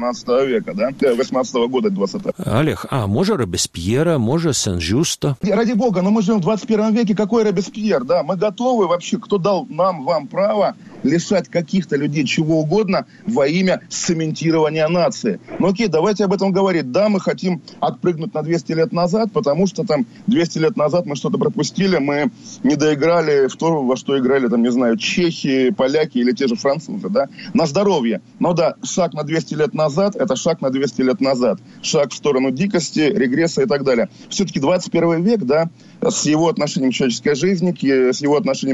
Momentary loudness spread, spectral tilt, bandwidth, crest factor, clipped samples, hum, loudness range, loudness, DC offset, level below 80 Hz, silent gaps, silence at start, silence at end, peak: 5 LU; -5.5 dB/octave; 13 kHz; 16 dB; under 0.1%; none; 2 LU; -18 LUFS; under 0.1%; -50 dBFS; none; 0 s; 0 s; -2 dBFS